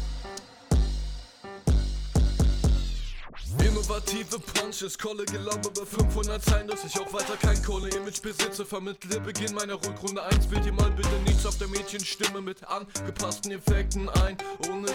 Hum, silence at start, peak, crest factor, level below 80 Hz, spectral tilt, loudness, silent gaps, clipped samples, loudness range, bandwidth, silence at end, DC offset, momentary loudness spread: none; 0 s; -12 dBFS; 14 dB; -30 dBFS; -4.5 dB/octave; -29 LUFS; none; under 0.1%; 2 LU; 18 kHz; 0 s; under 0.1%; 9 LU